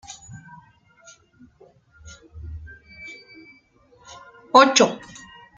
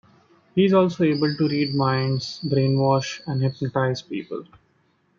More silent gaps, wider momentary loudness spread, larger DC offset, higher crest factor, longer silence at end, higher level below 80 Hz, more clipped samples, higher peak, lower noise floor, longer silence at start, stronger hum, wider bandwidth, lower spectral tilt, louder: neither; first, 29 LU vs 11 LU; neither; first, 24 dB vs 16 dB; second, 0.6 s vs 0.75 s; first, -52 dBFS vs -62 dBFS; neither; first, -2 dBFS vs -6 dBFS; second, -56 dBFS vs -64 dBFS; second, 0.1 s vs 0.55 s; neither; first, 9.6 kHz vs 7.4 kHz; second, -2.5 dB/octave vs -7 dB/octave; first, -16 LUFS vs -22 LUFS